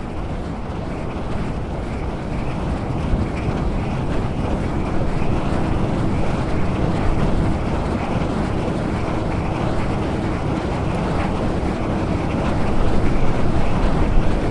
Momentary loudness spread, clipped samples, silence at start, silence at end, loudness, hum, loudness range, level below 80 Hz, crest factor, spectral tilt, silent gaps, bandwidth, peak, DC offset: 6 LU; under 0.1%; 0 s; 0 s; -22 LUFS; none; 3 LU; -24 dBFS; 16 dB; -7.5 dB/octave; none; 10.5 kHz; -4 dBFS; under 0.1%